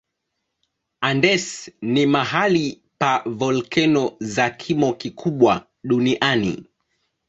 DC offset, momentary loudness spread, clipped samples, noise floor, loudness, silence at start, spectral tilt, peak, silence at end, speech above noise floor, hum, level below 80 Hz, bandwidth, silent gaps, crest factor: under 0.1%; 8 LU; under 0.1%; -77 dBFS; -20 LUFS; 1 s; -5 dB/octave; -2 dBFS; 0.65 s; 58 dB; none; -58 dBFS; 8.2 kHz; none; 20 dB